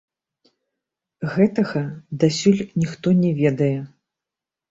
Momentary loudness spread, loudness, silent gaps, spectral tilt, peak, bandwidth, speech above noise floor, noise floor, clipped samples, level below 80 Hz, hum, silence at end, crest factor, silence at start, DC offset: 12 LU; -21 LUFS; none; -7 dB/octave; -4 dBFS; 7.8 kHz; 68 dB; -87 dBFS; under 0.1%; -58 dBFS; none; 0.85 s; 18 dB; 1.2 s; under 0.1%